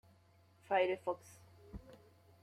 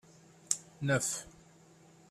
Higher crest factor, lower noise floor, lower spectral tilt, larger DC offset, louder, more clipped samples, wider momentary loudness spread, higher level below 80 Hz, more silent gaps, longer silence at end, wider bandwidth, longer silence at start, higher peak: second, 20 dB vs 28 dB; first, -68 dBFS vs -60 dBFS; first, -5 dB/octave vs -3.5 dB/octave; neither; second, -37 LUFS vs -34 LUFS; neither; first, 26 LU vs 9 LU; about the same, -66 dBFS vs -68 dBFS; neither; second, 0.45 s vs 0.8 s; about the same, 14 kHz vs 14.5 kHz; first, 0.7 s vs 0.5 s; second, -20 dBFS vs -10 dBFS